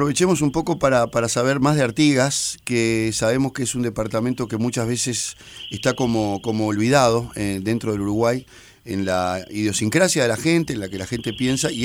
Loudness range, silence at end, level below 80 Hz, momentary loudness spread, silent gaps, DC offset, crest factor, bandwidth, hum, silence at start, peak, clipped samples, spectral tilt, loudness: 3 LU; 0 s; -48 dBFS; 8 LU; none; under 0.1%; 18 dB; 19 kHz; none; 0 s; -2 dBFS; under 0.1%; -4.5 dB/octave; -21 LUFS